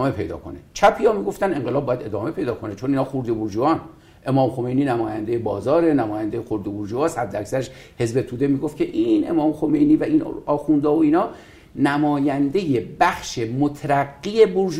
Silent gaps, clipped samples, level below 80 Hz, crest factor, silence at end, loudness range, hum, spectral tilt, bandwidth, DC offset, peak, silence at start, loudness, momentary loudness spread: none; under 0.1%; -50 dBFS; 20 dB; 0 s; 3 LU; none; -7 dB/octave; 14 kHz; under 0.1%; 0 dBFS; 0 s; -21 LUFS; 9 LU